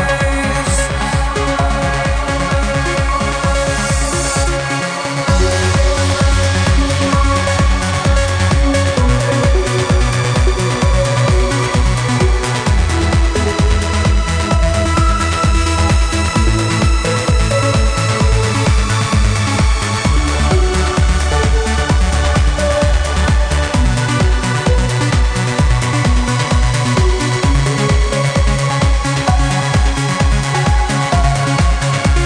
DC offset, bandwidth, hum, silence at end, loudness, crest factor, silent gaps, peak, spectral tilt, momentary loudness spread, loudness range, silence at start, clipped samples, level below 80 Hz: under 0.1%; 10 kHz; none; 0 s; -14 LUFS; 12 dB; none; 0 dBFS; -5 dB/octave; 2 LU; 1 LU; 0 s; under 0.1%; -16 dBFS